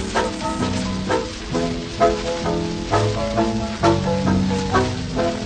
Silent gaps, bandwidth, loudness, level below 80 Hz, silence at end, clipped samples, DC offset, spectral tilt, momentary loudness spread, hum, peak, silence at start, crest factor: none; 9.6 kHz; -21 LUFS; -36 dBFS; 0 s; under 0.1%; under 0.1%; -5.5 dB/octave; 5 LU; none; -4 dBFS; 0 s; 16 dB